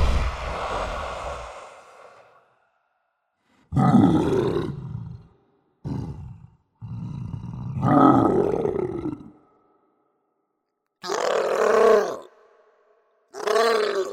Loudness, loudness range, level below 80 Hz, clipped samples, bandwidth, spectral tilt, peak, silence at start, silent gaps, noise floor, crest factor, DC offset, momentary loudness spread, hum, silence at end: -22 LUFS; 10 LU; -38 dBFS; under 0.1%; 16 kHz; -6.5 dB/octave; -2 dBFS; 0 s; none; -78 dBFS; 24 dB; under 0.1%; 22 LU; none; 0 s